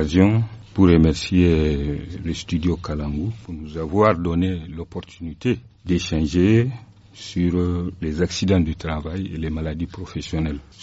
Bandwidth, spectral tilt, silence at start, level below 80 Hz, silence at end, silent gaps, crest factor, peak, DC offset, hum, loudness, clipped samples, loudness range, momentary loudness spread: 8 kHz; -7 dB/octave; 0 s; -34 dBFS; 0 s; none; 20 dB; -2 dBFS; under 0.1%; none; -21 LUFS; under 0.1%; 3 LU; 13 LU